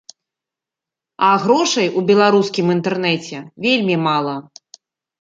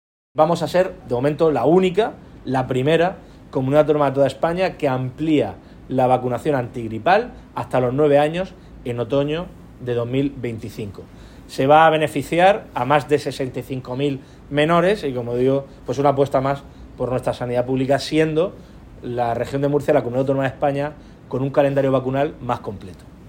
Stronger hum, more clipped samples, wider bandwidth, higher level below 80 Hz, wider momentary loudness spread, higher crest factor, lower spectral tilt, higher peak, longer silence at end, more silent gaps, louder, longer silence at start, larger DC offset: neither; neither; second, 9 kHz vs 16.5 kHz; second, -66 dBFS vs -46 dBFS; second, 9 LU vs 13 LU; about the same, 16 dB vs 18 dB; second, -4.5 dB/octave vs -7 dB/octave; about the same, -2 dBFS vs 0 dBFS; first, 0.8 s vs 0 s; neither; first, -16 LUFS vs -20 LUFS; first, 1.2 s vs 0.35 s; neither